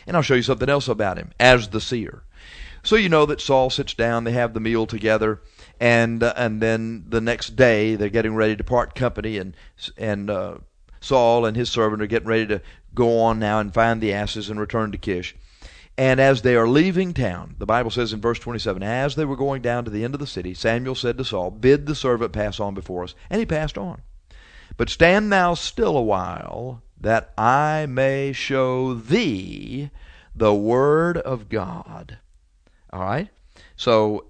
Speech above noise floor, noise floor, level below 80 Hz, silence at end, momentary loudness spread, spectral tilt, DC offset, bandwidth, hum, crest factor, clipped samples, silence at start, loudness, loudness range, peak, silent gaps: 35 dB; -56 dBFS; -40 dBFS; 0.1 s; 14 LU; -6 dB/octave; under 0.1%; 9.6 kHz; none; 22 dB; under 0.1%; 0.05 s; -21 LUFS; 4 LU; 0 dBFS; none